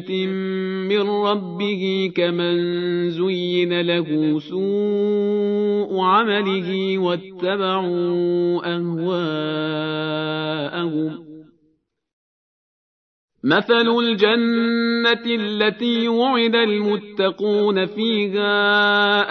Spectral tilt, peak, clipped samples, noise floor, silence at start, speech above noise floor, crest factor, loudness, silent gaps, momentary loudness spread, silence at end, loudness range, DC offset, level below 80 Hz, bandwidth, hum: -7 dB/octave; -4 dBFS; under 0.1%; -65 dBFS; 0 s; 46 dB; 18 dB; -20 LUFS; 12.13-13.28 s; 7 LU; 0 s; 7 LU; under 0.1%; -72 dBFS; 6.2 kHz; none